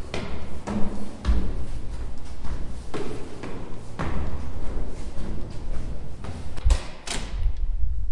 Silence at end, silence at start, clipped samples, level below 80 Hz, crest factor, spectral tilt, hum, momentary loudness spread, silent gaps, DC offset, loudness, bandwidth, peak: 0 s; 0 s; under 0.1%; -30 dBFS; 14 dB; -5.5 dB/octave; none; 10 LU; none; under 0.1%; -33 LUFS; 11 kHz; -6 dBFS